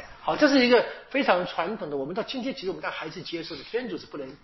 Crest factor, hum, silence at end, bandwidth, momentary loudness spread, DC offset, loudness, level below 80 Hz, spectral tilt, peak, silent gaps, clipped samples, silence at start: 22 dB; none; 0.1 s; 6.2 kHz; 15 LU; under 0.1%; -26 LUFS; -60 dBFS; -2 dB/octave; -4 dBFS; none; under 0.1%; 0 s